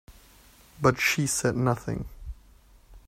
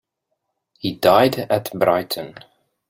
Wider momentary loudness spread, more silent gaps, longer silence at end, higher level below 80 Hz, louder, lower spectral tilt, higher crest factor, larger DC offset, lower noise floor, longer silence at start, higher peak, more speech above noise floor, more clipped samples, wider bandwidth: first, 20 LU vs 14 LU; neither; second, 0.1 s vs 0.6 s; first, -48 dBFS vs -58 dBFS; second, -26 LUFS vs -19 LUFS; about the same, -4.5 dB/octave vs -5 dB/octave; about the same, 22 dB vs 20 dB; neither; second, -55 dBFS vs -76 dBFS; second, 0.1 s vs 0.85 s; second, -6 dBFS vs -2 dBFS; second, 30 dB vs 58 dB; neither; about the same, 16 kHz vs 16.5 kHz